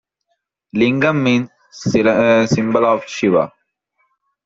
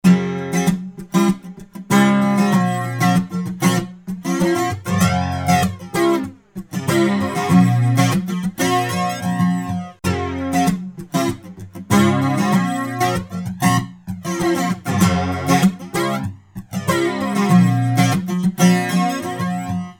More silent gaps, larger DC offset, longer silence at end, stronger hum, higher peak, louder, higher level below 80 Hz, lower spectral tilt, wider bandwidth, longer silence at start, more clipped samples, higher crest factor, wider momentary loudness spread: neither; neither; first, 1 s vs 0.05 s; neither; about the same, -2 dBFS vs -2 dBFS; about the same, -16 LUFS vs -18 LUFS; second, -54 dBFS vs -48 dBFS; about the same, -6 dB/octave vs -6 dB/octave; second, 7.8 kHz vs 18 kHz; first, 0.75 s vs 0.05 s; neither; about the same, 14 dB vs 16 dB; about the same, 12 LU vs 11 LU